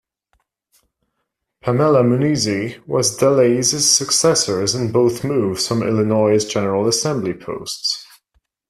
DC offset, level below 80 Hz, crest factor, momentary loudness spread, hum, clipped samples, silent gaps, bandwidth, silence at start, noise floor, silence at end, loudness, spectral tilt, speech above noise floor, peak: under 0.1%; -54 dBFS; 18 dB; 9 LU; none; under 0.1%; none; 14.5 kHz; 1.65 s; -75 dBFS; 0.65 s; -17 LUFS; -4 dB/octave; 58 dB; 0 dBFS